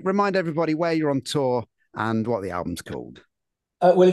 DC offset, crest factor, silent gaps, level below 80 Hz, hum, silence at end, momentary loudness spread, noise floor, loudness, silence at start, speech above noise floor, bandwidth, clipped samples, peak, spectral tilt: under 0.1%; 18 dB; none; -62 dBFS; none; 0 s; 14 LU; -83 dBFS; -24 LUFS; 0 s; 61 dB; 12.5 kHz; under 0.1%; -6 dBFS; -6.5 dB/octave